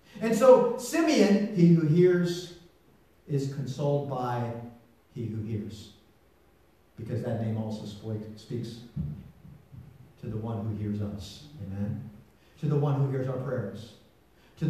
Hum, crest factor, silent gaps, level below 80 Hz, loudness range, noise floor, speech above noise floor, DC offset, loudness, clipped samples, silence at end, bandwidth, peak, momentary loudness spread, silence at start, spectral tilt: none; 22 dB; none; -60 dBFS; 12 LU; -62 dBFS; 35 dB; under 0.1%; -28 LUFS; under 0.1%; 0 s; 14 kHz; -6 dBFS; 20 LU; 0.15 s; -7 dB/octave